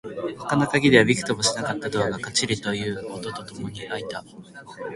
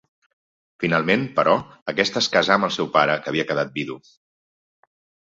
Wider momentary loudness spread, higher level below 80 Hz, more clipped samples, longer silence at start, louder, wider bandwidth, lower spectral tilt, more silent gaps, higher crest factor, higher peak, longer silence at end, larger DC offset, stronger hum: first, 19 LU vs 9 LU; first, -54 dBFS vs -62 dBFS; neither; second, 0.05 s vs 0.8 s; about the same, -23 LUFS vs -21 LUFS; first, 11.5 kHz vs 7.8 kHz; about the same, -4 dB/octave vs -4.5 dB/octave; second, none vs 1.82-1.86 s; about the same, 24 dB vs 22 dB; about the same, -2 dBFS vs -2 dBFS; second, 0 s vs 1.25 s; neither; neither